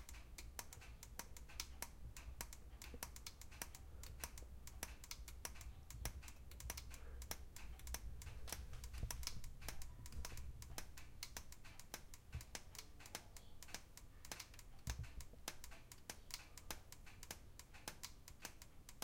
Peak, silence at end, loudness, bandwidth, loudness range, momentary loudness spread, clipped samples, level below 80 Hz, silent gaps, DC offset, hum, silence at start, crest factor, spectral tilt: -26 dBFS; 0 s; -54 LUFS; 17 kHz; 3 LU; 6 LU; under 0.1%; -56 dBFS; none; under 0.1%; none; 0 s; 28 dB; -2.5 dB/octave